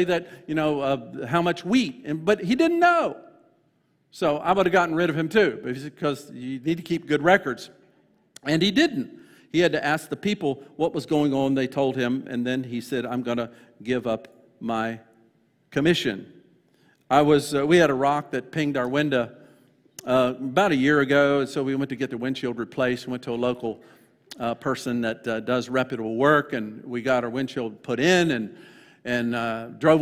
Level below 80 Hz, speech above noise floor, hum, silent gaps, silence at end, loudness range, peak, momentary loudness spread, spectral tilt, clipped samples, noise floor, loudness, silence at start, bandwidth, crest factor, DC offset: -60 dBFS; 43 dB; none; none; 0 s; 6 LU; -4 dBFS; 12 LU; -5.5 dB/octave; under 0.1%; -67 dBFS; -24 LUFS; 0 s; 15.5 kHz; 20 dB; under 0.1%